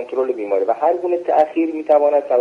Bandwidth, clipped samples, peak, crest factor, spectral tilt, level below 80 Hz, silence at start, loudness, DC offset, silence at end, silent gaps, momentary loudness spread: 6.4 kHz; under 0.1%; -4 dBFS; 14 dB; -6.5 dB/octave; -70 dBFS; 0 s; -17 LUFS; under 0.1%; 0 s; none; 7 LU